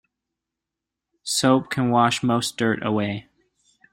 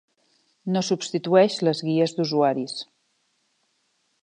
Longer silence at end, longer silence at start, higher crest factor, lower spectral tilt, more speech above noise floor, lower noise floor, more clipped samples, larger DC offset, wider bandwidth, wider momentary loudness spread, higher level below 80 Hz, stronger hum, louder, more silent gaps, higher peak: second, 0.7 s vs 1.4 s; first, 1.25 s vs 0.65 s; about the same, 20 dB vs 20 dB; about the same, -4.5 dB/octave vs -5.5 dB/octave; first, 64 dB vs 48 dB; first, -86 dBFS vs -70 dBFS; neither; neither; first, 16 kHz vs 10 kHz; second, 9 LU vs 15 LU; first, -62 dBFS vs -78 dBFS; neither; about the same, -21 LUFS vs -23 LUFS; neither; about the same, -4 dBFS vs -6 dBFS